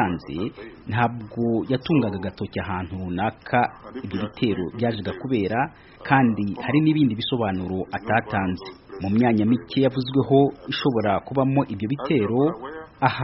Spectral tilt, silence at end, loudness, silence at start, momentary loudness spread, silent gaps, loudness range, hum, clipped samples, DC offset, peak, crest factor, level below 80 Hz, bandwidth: -5.5 dB/octave; 0 s; -23 LUFS; 0 s; 11 LU; none; 4 LU; none; under 0.1%; under 0.1%; -2 dBFS; 22 dB; -52 dBFS; 5.8 kHz